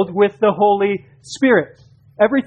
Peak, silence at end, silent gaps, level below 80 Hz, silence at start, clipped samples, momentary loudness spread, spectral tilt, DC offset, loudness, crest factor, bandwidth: -2 dBFS; 0 s; none; -58 dBFS; 0 s; under 0.1%; 13 LU; -6 dB/octave; under 0.1%; -16 LUFS; 16 dB; 9.4 kHz